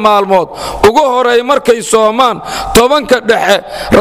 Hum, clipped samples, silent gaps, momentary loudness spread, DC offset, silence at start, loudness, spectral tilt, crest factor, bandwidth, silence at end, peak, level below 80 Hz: none; 0.8%; none; 4 LU; 0.3%; 0 s; -10 LUFS; -3.5 dB/octave; 10 dB; 16.5 kHz; 0 s; 0 dBFS; -32 dBFS